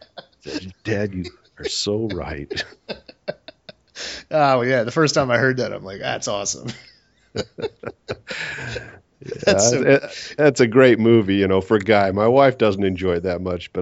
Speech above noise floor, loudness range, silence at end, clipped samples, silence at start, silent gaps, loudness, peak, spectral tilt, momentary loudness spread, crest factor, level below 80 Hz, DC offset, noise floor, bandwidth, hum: 26 dB; 12 LU; 0 s; under 0.1%; 0.15 s; none; -19 LUFS; 0 dBFS; -4.5 dB/octave; 19 LU; 20 dB; -50 dBFS; under 0.1%; -45 dBFS; 8 kHz; none